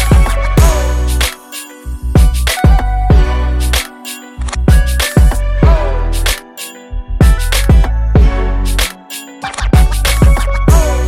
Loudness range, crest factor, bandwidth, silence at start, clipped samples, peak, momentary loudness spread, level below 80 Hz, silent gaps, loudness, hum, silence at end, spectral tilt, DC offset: 1 LU; 10 dB; 17 kHz; 0 s; under 0.1%; 0 dBFS; 14 LU; -12 dBFS; none; -13 LUFS; none; 0 s; -5 dB/octave; under 0.1%